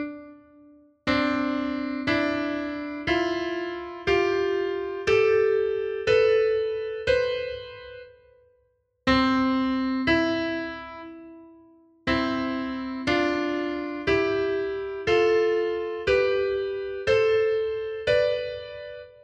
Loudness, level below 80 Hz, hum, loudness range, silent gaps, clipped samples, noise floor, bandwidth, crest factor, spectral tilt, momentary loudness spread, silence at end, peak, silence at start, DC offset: -25 LUFS; -50 dBFS; none; 4 LU; none; under 0.1%; -69 dBFS; 8 kHz; 16 dB; -5.5 dB/octave; 13 LU; 0.1 s; -8 dBFS; 0 s; under 0.1%